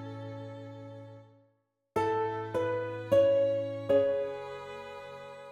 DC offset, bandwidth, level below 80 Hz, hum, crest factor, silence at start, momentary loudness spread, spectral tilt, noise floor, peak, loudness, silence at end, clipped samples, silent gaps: under 0.1%; 11.5 kHz; -68 dBFS; none; 18 dB; 0 s; 20 LU; -7 dB/octave; -74 dBFS; -14 dBFS; -30 LUFS; 0 s; under 0.1%; none